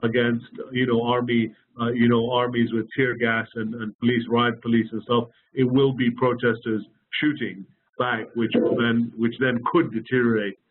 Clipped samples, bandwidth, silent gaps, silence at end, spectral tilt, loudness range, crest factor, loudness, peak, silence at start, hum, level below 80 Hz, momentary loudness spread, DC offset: under 0.1%; 4.2 kHz; 3.95-3.99 s; 0.15 s; -4.5 dB/octave; 1 LU; 14 dB; -23 LUFS; -10 dBFS; 0 s; none; -62 dBFS; 10 LU; under 0.1%